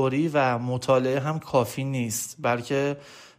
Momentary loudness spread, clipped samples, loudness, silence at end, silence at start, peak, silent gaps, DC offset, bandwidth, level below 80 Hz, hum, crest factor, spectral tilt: 6 LU; under 0.1%; -25 LUFS; 0.1 s; 0 s; -8 dBFS; none; under 0.1%; 15.5 kHz; -62 dBFS; none; 16 dB; -5.5 dB/octave